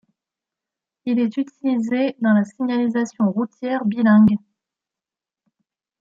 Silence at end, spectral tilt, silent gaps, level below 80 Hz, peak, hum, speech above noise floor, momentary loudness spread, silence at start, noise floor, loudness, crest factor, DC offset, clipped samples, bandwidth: 1.65 s; -7.5 dB/octave; none; -64 dBFS; -6 dBFS; none; 71 dB; 10 LU; 1.05 s; -89 dBFS; -20 LUFS; 14 dB; under 0.1%; under 0.1%; 7.4 kHz